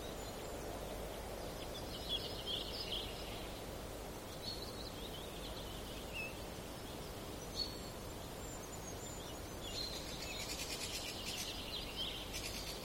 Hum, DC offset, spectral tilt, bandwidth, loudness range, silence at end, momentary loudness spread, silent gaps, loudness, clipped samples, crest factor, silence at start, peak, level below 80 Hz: none; under 0.1%; -3 dB/octave; 16.5 kHz; 4 LU; 0 s; 7 LU; none; -44 LUFS; under 0.1%; 18 dB; 0 s; -28 dBFS; -54 dBFS